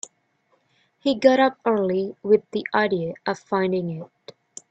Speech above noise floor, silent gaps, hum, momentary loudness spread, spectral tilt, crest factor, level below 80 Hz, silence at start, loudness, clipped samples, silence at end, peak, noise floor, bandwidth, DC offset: 45 dB; none; none; 20 LU; -5.5 dB/octave; 20 dB; -68 dBFS; 1.05 s; -22 LUFS; under 0.1%; 0.65 s; -2 dBFS; -67 dBFS; 8.8 kHz; under 0.1%